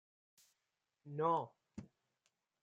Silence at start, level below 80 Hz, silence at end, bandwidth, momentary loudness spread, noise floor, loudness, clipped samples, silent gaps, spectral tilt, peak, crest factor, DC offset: 1.05 s; -80 dBFS; 0.75 s; 15 kHz; 20 LU; -89 dBFS; -39 LUFS; under 0.1%; none; -7.5 dB/octave; -24 dBFS; 22 dB; under 0.1%